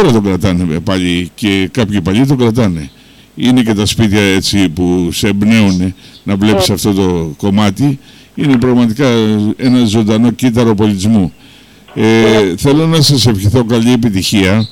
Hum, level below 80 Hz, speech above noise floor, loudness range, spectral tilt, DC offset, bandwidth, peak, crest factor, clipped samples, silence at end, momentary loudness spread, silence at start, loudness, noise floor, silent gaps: none; -36 dBFS; 28 dB; 2 LU; -5.5 dB/octave; under 0.1%; 17 kHz; -2 dBFS; 8 dB; under 0.1%; 0 s; 6 LU; 0 s; -11 LUFS; -39 dBFS; none